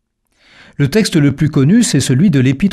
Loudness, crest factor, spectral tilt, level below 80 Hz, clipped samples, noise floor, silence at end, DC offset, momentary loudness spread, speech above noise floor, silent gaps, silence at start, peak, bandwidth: -12 LUFS; 10 dB; -6 dB/octave; -40 dBFS; under 0.1%; -55 dBFS; 0 s; under 0.1%; 3 LU; 44 dB; none; 0.8 s; -2 dBFS; 14.5 kHz